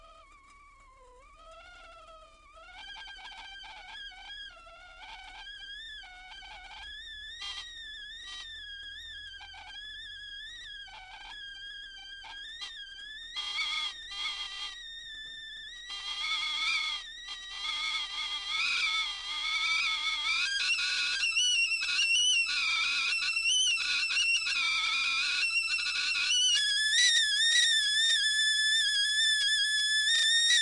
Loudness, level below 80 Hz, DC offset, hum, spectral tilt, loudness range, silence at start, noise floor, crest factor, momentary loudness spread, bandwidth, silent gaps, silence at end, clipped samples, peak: -27 LUFS; -62 dBFS; under 0.1%; none; 4 dB/octave; 20 LU; 0.05 s; -57 dBFS; 18 dB; 20 LU; 11.5 kHz; none; 0 s; under 0.1%; -14 dBFS